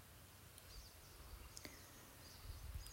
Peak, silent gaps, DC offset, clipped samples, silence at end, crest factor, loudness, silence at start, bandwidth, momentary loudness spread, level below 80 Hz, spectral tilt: -32 dBFS; none; under 0.1%; under 0.1%; 0 s; 24 dB; -58 LUFS; 0 s; 16 kHz; 6 LU; -60 dBFS; -3 dB/octave